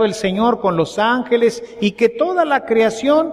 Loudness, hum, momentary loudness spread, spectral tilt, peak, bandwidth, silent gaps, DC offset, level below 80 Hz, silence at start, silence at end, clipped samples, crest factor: -17 LUFS; none; 3 LU; -5.5 dB/octave; -2 dBFS; 12 kHz; none; under 0.1%; -52 dBFS; 0 s; 0 s; under 0.1%; 14 dB